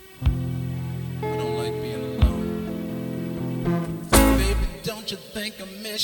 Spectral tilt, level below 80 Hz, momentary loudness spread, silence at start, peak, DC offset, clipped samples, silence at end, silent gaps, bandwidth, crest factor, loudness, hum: -5 dB/octave; -30 dBFS; 12 LU; 0 s; -2 dBFS; under 0.1%; under 0.1%; 0 s; none; over 20 kHz; 22 dB; -25 LUFS; none